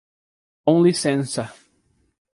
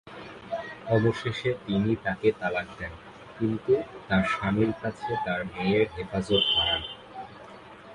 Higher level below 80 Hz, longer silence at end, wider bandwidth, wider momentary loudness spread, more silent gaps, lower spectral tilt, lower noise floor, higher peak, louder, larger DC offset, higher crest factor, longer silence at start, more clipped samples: second, -64 dBFS vs -52 dBFS; first, 0.85 s vs 0 s; about the same, 11.5 kHz vs 11 kHz; second, 12 LU vs 19 LU; neither; about the same, -5.5 dB/octave vs -6.5 dB/octave; first, -65 dBFS vs -46 dBFS; first, -2 dBFS vs -10 dBFS; first, -20 LUFS vs -27 LUFS; neither; about the same, 20 dB vs 18 dB; first, 0.65 s vs 0.05 s; neither